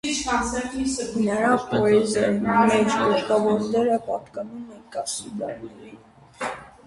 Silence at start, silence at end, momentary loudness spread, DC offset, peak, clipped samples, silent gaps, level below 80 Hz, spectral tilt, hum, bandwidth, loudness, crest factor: 0.05 s; 0.15 s; 15 LU; under 0.1%; -6 dBFS; under 0.1%; none; -50 dBFS; -4.5 dB/octave; none; 11.5 kHz; -23 LUFS; 18 dB